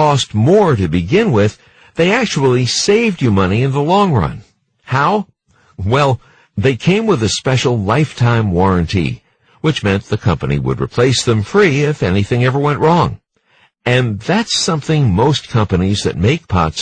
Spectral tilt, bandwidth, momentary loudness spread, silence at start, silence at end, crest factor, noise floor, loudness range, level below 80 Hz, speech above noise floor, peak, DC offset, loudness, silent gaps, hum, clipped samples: -5.5 dB/octave; 9.6 kHz; 6 LU; 0 s; 0 s; 12 dB; -54 dBFS; 2 LU; -38 dBFS; 41 dB; -2 dBFS; under 0.1%; -14 LUFS; none; none; under 0.1%